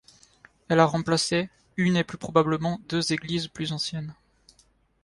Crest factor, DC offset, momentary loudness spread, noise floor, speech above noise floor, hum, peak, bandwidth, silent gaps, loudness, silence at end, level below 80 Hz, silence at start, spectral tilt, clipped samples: 22 dB; under 0.1%; 9 LU; -63 dBFS; 38 dB; none; -4 dBFS; 11.5 kHz; none; -26 LUFS; 0.9 s; -58 dBFS; 0.7 s; -5 dB/octave; under 0.1%